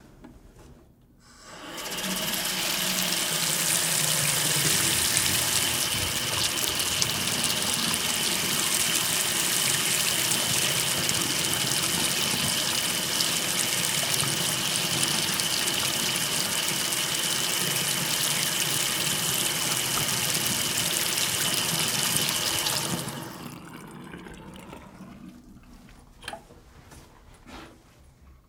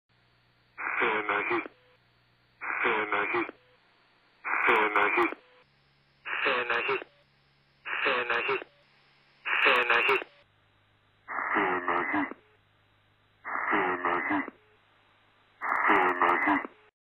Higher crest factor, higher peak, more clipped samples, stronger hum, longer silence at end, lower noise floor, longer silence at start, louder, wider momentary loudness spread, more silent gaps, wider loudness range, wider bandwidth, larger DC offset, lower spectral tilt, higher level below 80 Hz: about the same, 26 dB vs 22 dB; first, -2 dBFS vs -10 dBFS; neither; neither; second, 0.15 s vs 0.4 s; second, -55 dBFS vs -66 dBFS; second, 0.05 s vs 0.8 s; first, -23 LUFS vs -27 LUFS; second, 12 LU vs 15 LU; neither; about the same, 6 LU vs 5 LU; about the same, 19 kHz vs 18.5 kHz; neither; second, -1 dB/octave vs -5 dB/octave; first, -56 dBFS vs -70 dBFS